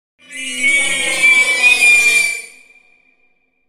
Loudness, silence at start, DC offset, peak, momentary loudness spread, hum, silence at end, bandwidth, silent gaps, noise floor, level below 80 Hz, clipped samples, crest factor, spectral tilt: -10 LUFS; 0.3 s; under 0.1%; 0 dBFS; 17 LU; none; 1.2 s; 16 kHz; none; -61 dBFS; -54 dBFS; under 0.1%; 14 dB; 1.5 dB/octave